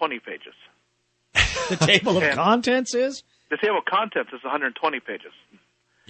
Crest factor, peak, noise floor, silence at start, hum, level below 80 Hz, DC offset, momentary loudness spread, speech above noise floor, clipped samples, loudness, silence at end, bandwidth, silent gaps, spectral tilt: 22 dB; -2 dBFS; -69 dBFS; 0 s; 60 Hz at -55 dBFS; -44 dBFS; under 0.1%; 17 LU; 46 dB; under 0.1%; -22 LUFS; 0.8 s; 8.8 kHz; none; -3.5 dB/octave